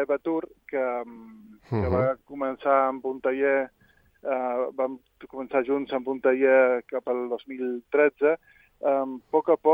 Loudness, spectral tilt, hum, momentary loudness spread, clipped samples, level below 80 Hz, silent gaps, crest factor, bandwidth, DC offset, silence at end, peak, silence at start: -26 LUFS; -9.5 dB/octave; none; 11 LU; under 0.1%; -60 dBFS; none; 18 dB; 5 kHz; under 0.1%; 0 s; -8 dBFS; 0 s